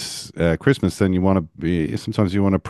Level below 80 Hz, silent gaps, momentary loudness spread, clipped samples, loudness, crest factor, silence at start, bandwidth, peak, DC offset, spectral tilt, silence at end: -36 dBFS; none; 5 LU; under 0.1%; -20 LUFS; 18 dB; 0 s; 12.5 kHz; 0 dBFS; under 0.1%; -6.5 dB/octave; 0 s